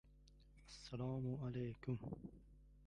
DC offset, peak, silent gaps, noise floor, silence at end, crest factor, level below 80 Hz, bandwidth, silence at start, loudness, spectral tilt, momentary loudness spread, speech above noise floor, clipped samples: under 0.1%; -32 dBFS; none; -67 dBFS; 0 s; 18 dB; -66 dBFS; 10.5 kHz; 0.05 s; -48 LUFS; -7.5 dB/octave; 21 LU; 21 dB; under 0.1%